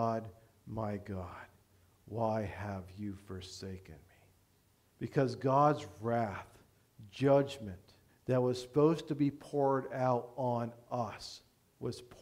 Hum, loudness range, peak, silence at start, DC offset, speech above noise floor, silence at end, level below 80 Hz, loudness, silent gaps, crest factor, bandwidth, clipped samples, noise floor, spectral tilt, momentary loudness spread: none; 9 LU; -14 dBFS; 0 s; under 0.1%; 36 dB; 0.05 s; -68 dBFS; -35 LUFS; none; 20 dB; 16 kHz; under 0.1%; -70 dBFS; -7 dB/octave; 18 LU